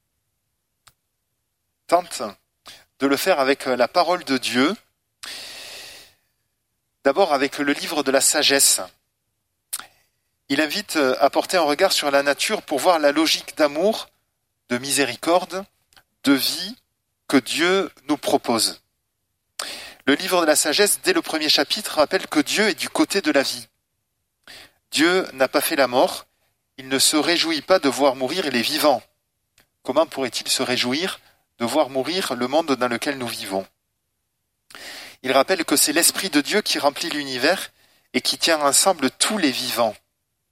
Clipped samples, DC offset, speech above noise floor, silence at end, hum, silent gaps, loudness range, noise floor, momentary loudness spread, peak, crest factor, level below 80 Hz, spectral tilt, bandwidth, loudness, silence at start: under 0.1%; under 0.1%; 55 dB; 0.6 s; none; none; 5 LU; -75 dBFS; 15 LU; 0 dBFS; 22 dB; -66 dBFS; -2 dB/octave; 16 kHz; -20 LUFS; 1.9 s